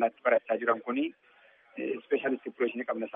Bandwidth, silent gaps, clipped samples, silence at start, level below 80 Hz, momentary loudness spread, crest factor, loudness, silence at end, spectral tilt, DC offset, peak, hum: 3.8 kHz; none; under 0.1%; 0 s; -90 dBFS; 9 LU; 18 dB; -31 LUFS; 0.05 s; -2.5 dB/octave; under 0.1%; -12 dBFS; none